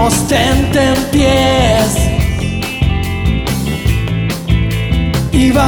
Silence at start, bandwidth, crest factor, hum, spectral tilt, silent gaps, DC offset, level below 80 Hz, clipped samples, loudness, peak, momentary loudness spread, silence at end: 0 s; over 20 kHz; 10 dB; none; -5 dB/octave; none; under 0.1%; -20 dBFS; under 0.1%; -13 LUFS; -2 dBFS; 6 LU; 0 s